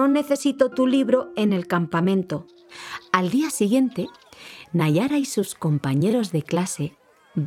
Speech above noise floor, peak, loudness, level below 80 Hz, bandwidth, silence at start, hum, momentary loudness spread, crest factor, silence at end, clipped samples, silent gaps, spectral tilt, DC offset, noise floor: 22 dB; -2 dBFS; -22 LUFS; -66 dBFS; 16 kHz; 0 s; none; 12 LU; 20 dB; 0 s; under 0.1%; none; -6 dB/octave; under 0.1%; -44 dBFS